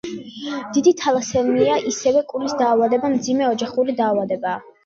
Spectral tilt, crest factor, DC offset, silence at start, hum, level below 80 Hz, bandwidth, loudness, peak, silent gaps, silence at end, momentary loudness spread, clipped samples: -4.5 dB/octave; 16 dB; under 0.1%; 0.05 s; none; -56 dBFS; 7.8 kHz; -19 LUFS; -4 dBFS; none; 0.25 s; 9 LU; under 0.1%